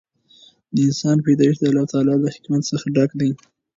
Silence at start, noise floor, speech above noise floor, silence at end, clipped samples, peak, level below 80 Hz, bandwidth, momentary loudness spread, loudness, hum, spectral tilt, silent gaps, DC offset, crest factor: 0.75 s; -52 dBFS; 34 dB; 0.4 s; under 0.1%; -4 dBFS; -62 dBFS; 7.6 kHz; 7 LU; -19 LUFS; none; -7 dB/octave; none; under 0.1%; 16 dB